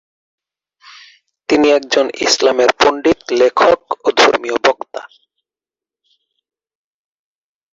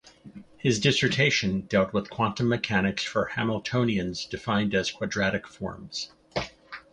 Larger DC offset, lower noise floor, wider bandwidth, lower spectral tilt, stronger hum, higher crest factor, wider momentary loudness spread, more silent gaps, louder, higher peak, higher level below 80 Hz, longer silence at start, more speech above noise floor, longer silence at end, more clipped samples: neither; first, under -90 dBFS vs -48 dBFS; first, 16 kHz vs 10.5 kHz; second, -2 dB/octave vs -5 dB/octave; neither; about the same, 16 dB vs 20 dB; second, 7 LU vs 12 LU; neither; first, -13 LUFS vs -26 LUFS; first, 0 dBFS vs -8 dBFS; about the same, -54 dBFS vs -52 dBFS; first, 1.5 s vs 0.05 s; first, over 77 dB vs 21 dB; first, 2.65 s vs 0.1 s; neither